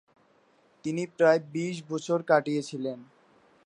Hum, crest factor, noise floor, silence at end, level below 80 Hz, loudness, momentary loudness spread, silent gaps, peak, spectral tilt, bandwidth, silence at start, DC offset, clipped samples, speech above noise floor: none; 22 dB; -64 dBFS; 0.6 s; -80 dBFS; -28 LUFS; 13 LU; none; -8 dBFS; -6 dB/octave; 11 kHz; 0.85 s; under 0.1%; under 0.1%; 37 dB